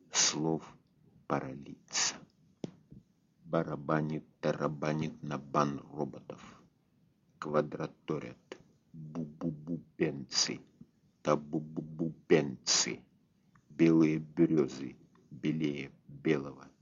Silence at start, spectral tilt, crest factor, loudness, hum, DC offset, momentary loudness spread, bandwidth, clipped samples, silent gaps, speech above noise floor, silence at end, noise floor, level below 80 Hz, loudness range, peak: 0.1 s; -4.5 dB/octave; 22 dB; -33 LUFS; none; under 0.1%; 19 LU; 7.4 kHz; under 0.1%; none; 37 dB; 0.15 s; -70 dBFS; -70 dBFS; 8 LU; -12 dBFS